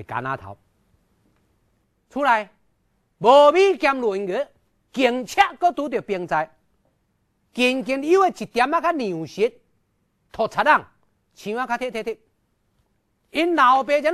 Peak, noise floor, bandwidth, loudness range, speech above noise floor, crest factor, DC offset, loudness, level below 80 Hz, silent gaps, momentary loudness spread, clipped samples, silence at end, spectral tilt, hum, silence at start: -2 dBFS; -68 dBFS; 13.5 kHz; 6 LU; 49 dB; 20 dB; under 0.1%; -20 LUFS; -60 dBFS; none; 17 LU; under 0.1%; 0 s; -4.5 dB/octave; none; 0 s